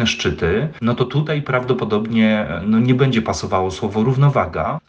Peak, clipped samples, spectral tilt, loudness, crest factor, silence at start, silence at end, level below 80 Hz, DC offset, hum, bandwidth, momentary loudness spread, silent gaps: -4 dBFS; under 0.1%; -6.5 dB/octave; -18 LUFS; 14 dB; 0 s; 0.1 s; -42 dBFS; under 0.1%; none; 8.4 kHz; 5 LU; none